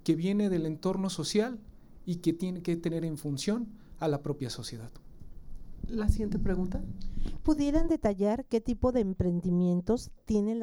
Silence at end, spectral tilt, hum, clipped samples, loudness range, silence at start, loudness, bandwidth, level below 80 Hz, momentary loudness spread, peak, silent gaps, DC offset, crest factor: 0 s; -6.5 dB/octave; none; under 0.1%; 6 LU; 0.05 s; -31 LUFS; 17.5 kHz; -40 dBFS; 12 LU; -12 dBFS; none; under 0.1%; 18 dB